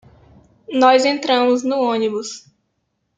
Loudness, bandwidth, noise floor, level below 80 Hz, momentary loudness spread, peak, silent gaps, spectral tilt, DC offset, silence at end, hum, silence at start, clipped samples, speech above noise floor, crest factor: -17 LUFS; 9.2 kHz; -71 dBFS; -62 dBFS; 15 LU; -2 dBFS; none; -3 dB/octave; under 0.1%; 0.8 s; none; 0.7 s; under 0.1%; 55 dB; 18 dB